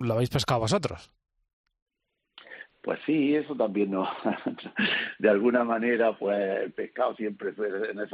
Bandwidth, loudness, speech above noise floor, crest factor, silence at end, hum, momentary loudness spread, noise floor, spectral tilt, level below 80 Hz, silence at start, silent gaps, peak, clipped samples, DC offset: 12.5 kHz; -27 LUFS; 55 dB; 18 dB; 0 s; none; 10 LU; -82 dBFS; -5.5 dB/octave; -60 dBFS; 0 s; 1.53-1.64 s, 1.82-1.86 s; -10 dBFS; under 0.1%; under 0.1%